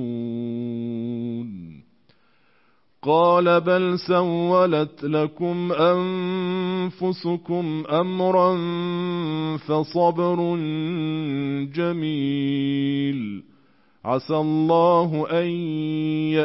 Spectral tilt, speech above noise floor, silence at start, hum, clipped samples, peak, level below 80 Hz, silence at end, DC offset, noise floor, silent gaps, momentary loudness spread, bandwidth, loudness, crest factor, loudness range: -11 dB/octave; 43 dB; 0 s; none; under 0.1%; -8 dBFS; -68 dBFS; 0 s; under 0.1%; -64 dBFS; none; 10 LU; 5.8 kHz; -22 LUFS; 16 dB; 4 LU